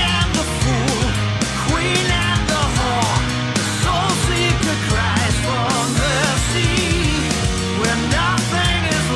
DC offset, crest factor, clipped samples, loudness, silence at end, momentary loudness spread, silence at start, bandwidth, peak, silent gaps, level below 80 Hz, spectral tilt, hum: under 0.1%; 16 dB; under 0.1%; -17 LUFS; 0 s; 2 LU; 0 s; 12 kHz; -2 dBFS; none; -28 dBFS; -4 dB/octave; none